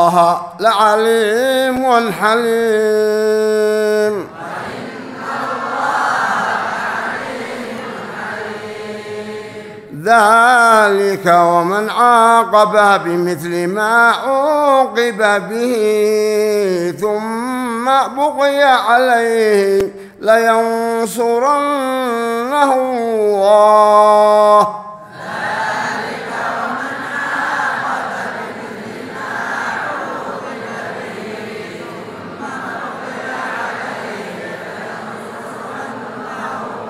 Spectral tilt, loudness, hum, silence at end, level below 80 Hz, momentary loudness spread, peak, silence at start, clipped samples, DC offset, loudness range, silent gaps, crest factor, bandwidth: -4 dB/octave; -14 LUFS; none; 0 s; -58 dBFS; 17 LU; 0 dBFS; 0 s; under 0.1%; under 0.1%; 13 LU; none; 14 dB; 16 kHz